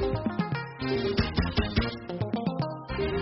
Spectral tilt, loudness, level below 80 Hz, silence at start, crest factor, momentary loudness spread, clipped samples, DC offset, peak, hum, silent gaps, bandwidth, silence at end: -5 dB/octave; -30 LUFS; -38 dBFS; 0 s; 18 dB; 6 LU; under 0.1%; under 0.1%; -12 dBFS; none; none; 6 kHz; 0 s